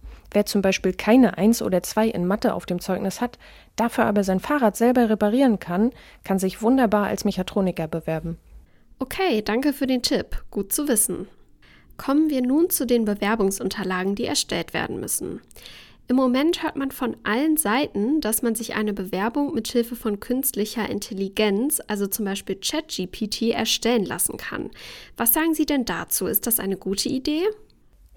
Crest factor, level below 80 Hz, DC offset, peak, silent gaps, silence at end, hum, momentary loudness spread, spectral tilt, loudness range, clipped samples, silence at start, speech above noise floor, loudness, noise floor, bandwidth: 20 dB; -46 dBFS; under 0.1%; -2 dBFS; none; 0.6 s; none; 10 LU; -4 dB/octave; 3 LU; under 0.1%; 0.05 s; 30 dB; -23 LUFS; -53 dBFS; 19 kHz